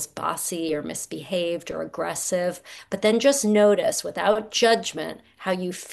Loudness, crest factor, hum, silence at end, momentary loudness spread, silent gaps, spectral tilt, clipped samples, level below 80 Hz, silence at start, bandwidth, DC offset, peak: -24 LUFS; 18 dB; none; 0 s; 13 LU; none; -3.5 dB/octave; under 0.1%; -64 dBFS; 0 s; 12.5 kHz; under 0.1%; -6 dBFS